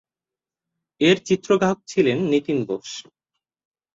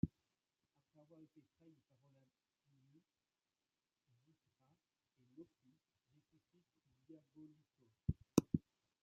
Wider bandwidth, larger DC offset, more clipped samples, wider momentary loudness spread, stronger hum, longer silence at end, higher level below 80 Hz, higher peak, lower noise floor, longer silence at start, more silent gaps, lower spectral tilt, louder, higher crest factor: first, 7.8 kHz vs 6.8 kHz; neither; neither; second, 11 LU vs 27 LU; neither; first, 0.95 s vs 0.45 s; about the same, -62 dBFS vs -66 dBFS; first, -2 dBFS vs -16 dBFS; about the same, -90 dBFS vs under -90 dBFS; first, 1 s vs 0.05 s; neither; second, -5.5 dB/octave vs -8.5 dB/octave; first, -21 LUFS vs -42 LUFS; second, 20 dB vs 34 dB